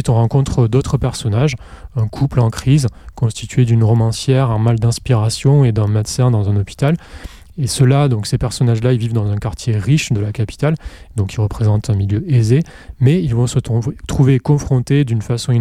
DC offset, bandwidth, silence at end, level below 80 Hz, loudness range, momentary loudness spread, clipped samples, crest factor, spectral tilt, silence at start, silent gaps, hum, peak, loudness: under 0.1%; 13.5 kHz; 0 s; -34 dBFS; 3 LU; 8 LU; under 0.1%; 12 dB; -6.5 dB/octave; 0 s; none; none; -2 dBFS; -16 LUFS